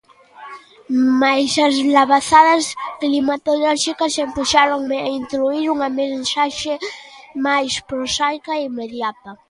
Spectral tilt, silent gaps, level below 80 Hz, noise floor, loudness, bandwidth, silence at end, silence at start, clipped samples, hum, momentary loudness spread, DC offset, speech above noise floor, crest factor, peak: -2 dB/octave; none; -54 dBFS; -40 dBFS; -17 LUFS; 11.5 kHz; 0.15 s; 0.4 s; under 0.1%; none; 12 LU; under 0.1%; 23 dB; 18 dB; 0 dBFS